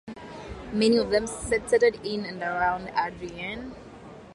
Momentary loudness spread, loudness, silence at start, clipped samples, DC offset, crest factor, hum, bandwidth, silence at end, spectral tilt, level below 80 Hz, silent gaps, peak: 19 LU; -26 LUFS; 0.05 s; under 0.1%; under 0.1%; 18 dB; none; 11.5 kHz; 0 s; -4.5 dB/octave; -50 dBFS; none; -10 dBFS